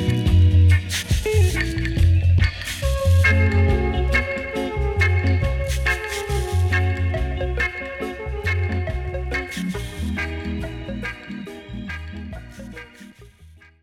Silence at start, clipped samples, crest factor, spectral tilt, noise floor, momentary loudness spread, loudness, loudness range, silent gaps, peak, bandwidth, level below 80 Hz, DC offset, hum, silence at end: 0 s; under 0.1%; 14 dB; -6 dB/octave; -48 dBFS; 17 LU; -21 LUFS; 11 LU; none; -6 dBFS; 13.5 kHz; -28 dBFS; under 0.1%; none; 0.35 s